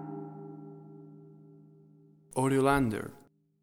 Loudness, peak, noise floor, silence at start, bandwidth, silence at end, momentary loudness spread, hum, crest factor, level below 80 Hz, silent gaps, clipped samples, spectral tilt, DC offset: -30 LUFS; -12 dBFS; -59 dBFS; 0 s; 16.5 kHz; 0.45 s; 25 LU; none; 22 dB; -56 dBFS; none; under 0.1%; -6.5 dB/octave; under 0.1%